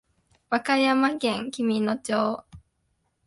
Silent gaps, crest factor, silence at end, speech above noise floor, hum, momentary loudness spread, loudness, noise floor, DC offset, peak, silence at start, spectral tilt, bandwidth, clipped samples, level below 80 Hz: none; 18 dB; 0.65 s; 49 dB; none; 7 LU; -25 LUFS; -73 dBFS; under 0.1%; -8 dBFS; 0.5 s; -4.5 dB/octave; 11.5 kHz; under 0.1%; -64 dBFS